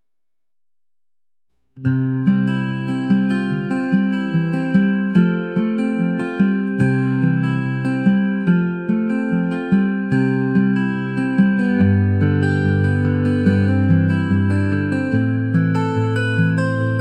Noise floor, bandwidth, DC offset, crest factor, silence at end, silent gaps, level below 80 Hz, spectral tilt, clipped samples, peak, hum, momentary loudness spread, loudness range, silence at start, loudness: under -90 dBFS; 9 kHz; 0.2%; 14 dB; 0 s; none; -54 dBFS; -9 dB/octave; under 0.1%; -4 dBFS; none; 4 LU; 3 LU; 1.75 s; -18 LUFS